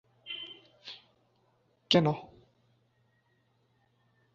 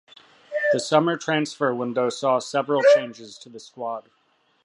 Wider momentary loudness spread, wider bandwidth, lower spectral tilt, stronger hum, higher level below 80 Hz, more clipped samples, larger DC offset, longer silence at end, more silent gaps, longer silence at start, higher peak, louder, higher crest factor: about the same, 22 LU vs 20 LU; second, 7.2 kHz vs 11.5 kHz; about the same, -4 dB/octave vs -4.5 dB/octave; neither; first, -72 dBFS vs -78 dBFS; neither; neither; first, 2.1 s vs 0.65 s; neither; second, 0.25 s vs 0.5 s; second, -10 dBFS vs -4 dBFS; second, -30 LUFS vs -22 LUFS; first, 26 dB vs 20 dB